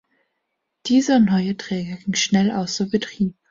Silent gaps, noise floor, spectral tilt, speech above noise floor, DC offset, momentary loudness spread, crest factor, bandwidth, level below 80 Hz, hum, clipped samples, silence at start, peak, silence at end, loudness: none; -76 dBFS; -5 dB/octave; 57 dB; under 0.1%; 10 LU; 14 dB; 7.6 kHz; -56 dBFS; none; under 0.1%; 0.85 s; -6 dBFS; 0.2 s; -20 LUFS